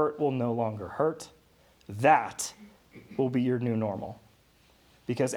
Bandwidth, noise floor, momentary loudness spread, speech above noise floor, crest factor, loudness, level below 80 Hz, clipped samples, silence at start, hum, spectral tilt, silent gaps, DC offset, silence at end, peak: 18.5 kHz; -62 dBFS; 20 LU; 34 dB; 22 dB; -29 LUFS; -68 dBFS; under 0.1%; 0 s; none; -6 dB/octave; none; under 0.1%; 0 s; -8 dBFS